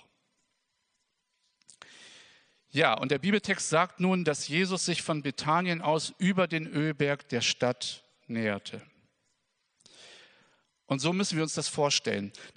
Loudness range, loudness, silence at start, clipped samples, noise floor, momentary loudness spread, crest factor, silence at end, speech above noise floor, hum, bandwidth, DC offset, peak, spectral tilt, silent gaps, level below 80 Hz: 7 LU; -29 LUFS; 2 s; under 0.1%; -78 dBFS; 9 LU; 24 dB; 0.05 s; 50 dB; none; 10 kHz; under 0.1%; -6 dBFS; -4 dB/octave; none; -76 dBFS